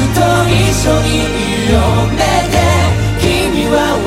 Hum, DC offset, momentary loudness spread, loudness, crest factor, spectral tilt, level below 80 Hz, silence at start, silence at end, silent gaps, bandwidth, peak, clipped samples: none; under 0.1%; 3 LU; -12 LUFS; 12 dB; -5 dB/octave; -22 dBFS; 0 s; 0 s; none; 16 kHz; 0 dBFS; under 0.1%